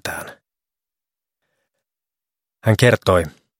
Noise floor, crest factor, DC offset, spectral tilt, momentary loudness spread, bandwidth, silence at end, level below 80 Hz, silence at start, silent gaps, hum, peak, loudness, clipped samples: -89 dBFS; 22 dB; under 0.1%; -5.5 dB/octave; 17 LU; 16.5 kHz; 0.3 s; -48 dBFS; 0.05 s; none; none; 0 dBFS; -17 LUFS; under 0.1%